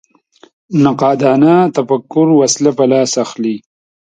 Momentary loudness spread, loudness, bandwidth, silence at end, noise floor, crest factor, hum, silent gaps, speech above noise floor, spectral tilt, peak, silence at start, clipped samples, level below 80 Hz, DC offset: 9 LU; -12 LUFS; 9.4 kHz; 0.55 s; -47 dBFS; 12 dB; none; none; 36 dB; -5.5 dB/octave; 0 dBFS; 0.7 s; under 0.1%; -58 dBFS; under 0.1%